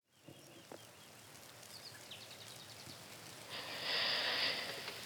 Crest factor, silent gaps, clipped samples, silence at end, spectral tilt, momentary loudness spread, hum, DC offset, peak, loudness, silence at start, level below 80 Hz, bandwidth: 20 dB; none; under 0.1%; 0 s; -1 dB/octave; 22 LU; none; under 0.1%; -24 dBFS; -40 LUFS; 0.15 s; -82 dBFS; over 20 kHz